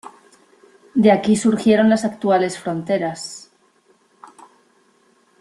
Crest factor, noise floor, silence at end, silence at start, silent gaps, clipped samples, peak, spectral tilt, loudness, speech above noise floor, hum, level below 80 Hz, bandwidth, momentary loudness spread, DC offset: 18 dB; -58 dBFS; 2 s; 0.05 s; none; under 0.1%; -2 dBFS; -5.5 dB/octave; -18 LUFS; 41 dB; none; -60 dBFS; 12 kHz; 13 LU; under 0.1%